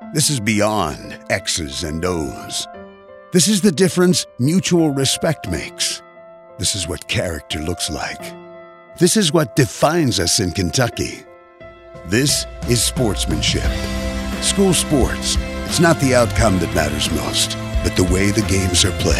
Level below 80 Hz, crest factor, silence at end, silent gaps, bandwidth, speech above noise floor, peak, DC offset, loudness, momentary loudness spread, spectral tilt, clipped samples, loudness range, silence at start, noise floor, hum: -30 dBFS; 16 dB; 0 s; none; 16 kHz; 24 dB; -2 dBFS; under 0.1%; -18 LUFS; 10 LU; -4 dB/octave; under 0.1%; 4 LU; 0 s; -41 dBFS; none